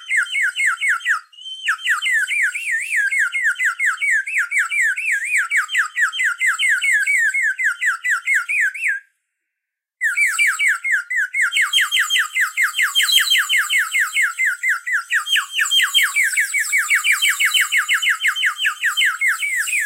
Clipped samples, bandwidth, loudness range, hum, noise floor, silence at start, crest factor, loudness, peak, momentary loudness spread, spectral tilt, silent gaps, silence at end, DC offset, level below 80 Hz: under 0.1%; 16 kHz; 3 LU; none; -82 dBFS; 0 s; 18 dB; -16 LUFS; -2 dBFS; 5 LU; 13.5 dB/octave; none; 0 s; under 0.1%; under -90 dBFS